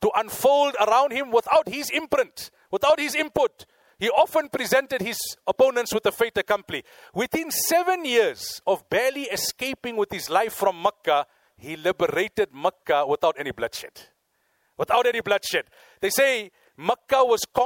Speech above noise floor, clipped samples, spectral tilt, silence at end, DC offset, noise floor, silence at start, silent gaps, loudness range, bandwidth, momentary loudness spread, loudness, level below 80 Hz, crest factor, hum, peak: 47 dB; under 0.1%; -2.5 dB/octave; 0 s; under 0.1%; -70 dBFS; 0 s; none; 3 LU; 17 kHz; 9 LU; -23 LUFS; -60 dBFS; 16 dB; none; -8 dBFS